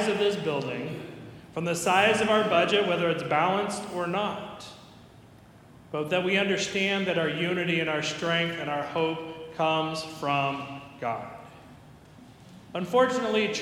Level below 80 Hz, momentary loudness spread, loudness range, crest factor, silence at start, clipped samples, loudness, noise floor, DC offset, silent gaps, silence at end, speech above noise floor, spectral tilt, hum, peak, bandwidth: -66 dBFS; 15 LU; 6 LU; 20 dB; 0 s; under 0.1%; -27 LUFS; -52 dBFS; under 0.1%; none; 0 s; 25 dB; -4.5 dB/octave; none; -8 dBFS; 18 kHz